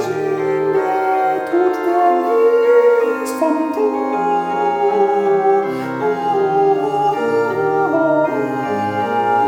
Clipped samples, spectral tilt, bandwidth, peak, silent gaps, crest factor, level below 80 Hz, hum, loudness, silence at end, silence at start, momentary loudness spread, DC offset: under 0.1%; -6.5 dB/octave; 17 kHz; -2 dBFS; none; 14 dB; -68 dBFS; none; -16 LUFS; 0 s; 0 s; 6 LU; under 0.1%